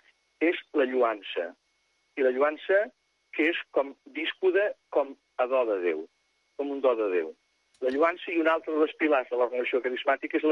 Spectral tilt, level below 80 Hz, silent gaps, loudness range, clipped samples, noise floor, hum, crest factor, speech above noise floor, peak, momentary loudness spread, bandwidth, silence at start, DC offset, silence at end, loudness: -4.5 dB/octave; -80 dBFS; none; 2 LU; under 0.1%; -72 dBFS; none; 16 dB; 45 dB; -12 dBFS; 10 LU; 6.6 kHz; 0.4 s; under 0.1%; 0 s; -28 LUFS